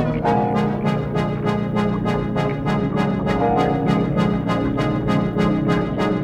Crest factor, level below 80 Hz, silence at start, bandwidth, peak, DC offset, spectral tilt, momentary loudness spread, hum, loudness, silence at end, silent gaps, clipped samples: 14 dB; -38 dBFS; 0 s; 10.5 kHz; -6 dBFS; under 0.1%; -8 dB/octave; 3 LU; none; -20 LUFS; 0 s; none; under 0.1%